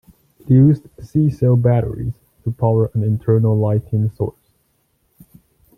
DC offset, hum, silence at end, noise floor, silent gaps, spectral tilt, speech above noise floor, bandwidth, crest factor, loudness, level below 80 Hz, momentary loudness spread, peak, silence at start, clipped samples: under 0.1%; none; 1.45 s; -64 dBFS; none; -11.5 dB/octave; 48 dB; 2.5 kHz; 16 dB; -17 LUFS; -46 dBFS; 13 LU; -2 dBFS; 0.45 s; under 0.1%